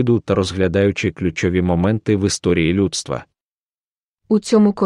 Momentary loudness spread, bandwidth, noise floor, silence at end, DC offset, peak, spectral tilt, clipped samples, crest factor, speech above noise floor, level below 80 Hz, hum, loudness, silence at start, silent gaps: 5 LU; 11.5 kHz; under -90 dBFS; 0 s; under 0.1%; -2 dBFS; -6 dB/octave; under 0.1%; 16 dB; over 73 dB; -42 dBFS; none; -18 LUFS; 0 s; 3.44-4.16 s